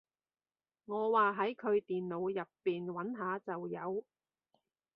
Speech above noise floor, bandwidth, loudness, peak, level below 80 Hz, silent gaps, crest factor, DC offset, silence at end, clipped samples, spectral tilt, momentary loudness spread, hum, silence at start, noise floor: over 54 dB; 5.2 kHz; -36 LUFS; -18 dBFS; -84 dBFS; none; 20 dB; under 0.1%; 0.95 s; under 0.1%; -5 dB/octave; 11 LU; none; 0.9 s; under -90 dBFS